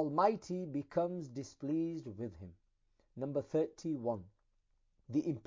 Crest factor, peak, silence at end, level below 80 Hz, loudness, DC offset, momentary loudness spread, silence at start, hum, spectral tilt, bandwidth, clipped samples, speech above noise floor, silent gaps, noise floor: 22 dB; -16 dBFS; 0.05 s; -70 dBFS; -38 LUFS; under 0.1%; 13 LU; 0 s; none; -7.5 dB/octave; 7.6 kHz; under 0.1%; 39 dB; none; -76 dBFS